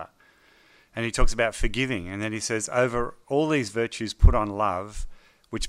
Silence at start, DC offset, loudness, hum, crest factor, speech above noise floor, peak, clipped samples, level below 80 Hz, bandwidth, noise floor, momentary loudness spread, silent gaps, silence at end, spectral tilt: 0 s; under 0.1%; -26 LUFS; none; 22 dB; 35 dB; -4 dBFS; under 0.1%; -28 dBFS; 12 kHz; -59 dBFS; 16 LU; none; 0 s; -5 dB/octave